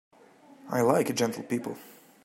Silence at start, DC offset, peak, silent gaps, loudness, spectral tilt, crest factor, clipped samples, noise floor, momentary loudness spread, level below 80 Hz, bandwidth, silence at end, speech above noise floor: 0.65 s; under 0.1%; -10 dBFS; none; -28 LUFS; -5 dB/octave; 20 dB; under 0.1%; -55 dBFS; 13 LU; -72 dBFS; 16 kHz; 0.35 s; 28 dB